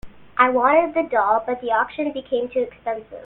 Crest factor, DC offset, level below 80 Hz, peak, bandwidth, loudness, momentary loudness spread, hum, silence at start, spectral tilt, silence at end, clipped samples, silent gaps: 20 dB; under 0.1%; -54 dBFS; 0 dBFS; 4.1 kHz; -21 LUFS; 11 LU; none; 0.05 s; -7.5 dB/octave; 0 s; under 0.1%; none